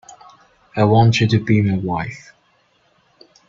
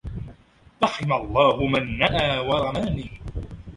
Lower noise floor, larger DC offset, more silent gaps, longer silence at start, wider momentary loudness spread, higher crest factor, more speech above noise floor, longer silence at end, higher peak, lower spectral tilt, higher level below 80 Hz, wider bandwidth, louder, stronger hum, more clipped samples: first, -60 dBFS vs -52 dBFS; neither; neither; first, 0.75 s vs 0.05 s; about the same, 16 LU vs 17 LU; about the same, 18 dB vs 20 dB; first, 44 dB vs 30 dB; first, 1.3 s vs 0 s; first, 0 dBFS vs -4 dBFS; about the same, -7 dB/octave vs -6 dB/octave; second, -50 dBFS vs -40 dBFS; second, 7.6 kHz vs 11.5 kHz; first, -16 LUFS vs -22 LUFS; neither; neither